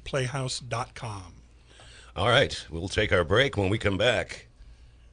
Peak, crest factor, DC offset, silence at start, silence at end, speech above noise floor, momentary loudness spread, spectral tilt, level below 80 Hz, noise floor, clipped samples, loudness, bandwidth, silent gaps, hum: -6 dBFS; 22 dB; under 0.1%; 0.05 s; 0.3 s; 26 dB; 16 LU; -4.5 dB/octave; -44 dBFS; -52 dBFS; under 0.1%; -26 LUFS; 10.5 kHz; none; none